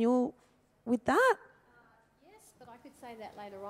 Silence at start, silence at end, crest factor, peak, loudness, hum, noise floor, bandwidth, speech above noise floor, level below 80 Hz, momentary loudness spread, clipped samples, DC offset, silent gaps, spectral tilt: 0 s; 0 s; 20 dB; -14 dBFS; -30 LUFS; none; -64 dBFS; 15.5 kHz; 34 dB; -70 dBFS; 25 LU; under 0.1%; under 0.1%; none; -5 dB/octave